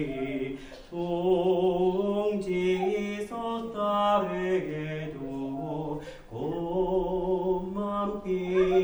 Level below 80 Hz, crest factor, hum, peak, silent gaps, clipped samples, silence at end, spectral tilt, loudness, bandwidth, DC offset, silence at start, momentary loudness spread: -50 dBFS; 16 dB; none; -12 dBFS; none; under 0.1%; 0 s; -7.5 dB/octave; -29 LUFS; over 20 kHz; under 0.1%; 0 s; 11 LU